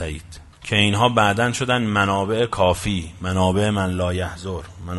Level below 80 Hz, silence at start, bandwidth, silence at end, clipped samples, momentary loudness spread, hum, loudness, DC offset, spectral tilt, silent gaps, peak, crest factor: -42 dBFS; 0 s; 11.5 kHz; 0 s; under 0.1%; 14 LU; none; -20 LUFS; under 0.1%; -5 dB/octave; none; -2 dBFS; 20 dB